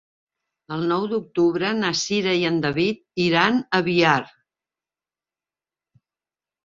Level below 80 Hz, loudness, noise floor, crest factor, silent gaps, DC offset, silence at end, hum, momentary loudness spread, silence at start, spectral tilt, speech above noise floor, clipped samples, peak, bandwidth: -62 dBFS; -21 LUFS; under -90 dBFS; 22 dB; none; under 0.1%; 2.35 s; none; 6 LU; 0.7 s; -4.5 dB/octave; over 69 dB; under 0.1%; -2 dBFS; 7.6 kHz